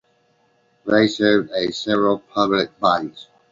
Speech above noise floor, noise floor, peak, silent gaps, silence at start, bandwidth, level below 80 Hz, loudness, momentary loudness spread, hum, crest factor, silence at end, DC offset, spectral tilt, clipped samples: 43 dB; -62 dBFS; -2 dBFS; none; 0.85 s; 7.6 kHz; -58 dBFS; -19 LUFS; 7 LU; none; 18 dB; 0.3 s; under 0.1%; -5 dB/octave; under 0.1%